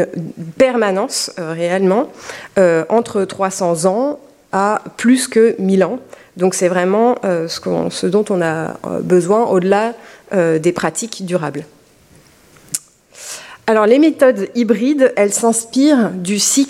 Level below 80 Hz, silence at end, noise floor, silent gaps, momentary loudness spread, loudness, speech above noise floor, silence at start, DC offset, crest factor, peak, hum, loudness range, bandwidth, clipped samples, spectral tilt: -60 dBFS; 0 s; -48 dBFS; none; 12 LU; -15 LUFS; 33 dB; 0 s; under 0.1%; 14 dB; 0 dBFS; none; 5 LU; 16 kHz; under 0.1%; -4.5 dB/octave